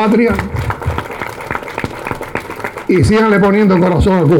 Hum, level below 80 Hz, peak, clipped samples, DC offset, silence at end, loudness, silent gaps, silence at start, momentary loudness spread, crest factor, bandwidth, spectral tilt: none; -30 dBFS; -2 dBFS; under 0.1%; under 0.1%; 0 s; -14 LUFS; none; 0 s; 13 LU; 10 dB; 17 kHz; -7.5 dB/octave